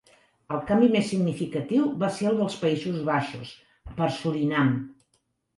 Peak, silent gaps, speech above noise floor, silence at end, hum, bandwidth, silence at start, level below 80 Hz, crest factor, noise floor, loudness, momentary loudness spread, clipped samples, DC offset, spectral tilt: -8 dBFS; none; 47 dB; 0.65 s; none; 11.5 kHz; 0.5 s; -56 dBFS; 18 dB; -72 dBFS; -26 LUFS; 13 LU; under 0.1%; under 0.1%; -6.5 dB/octave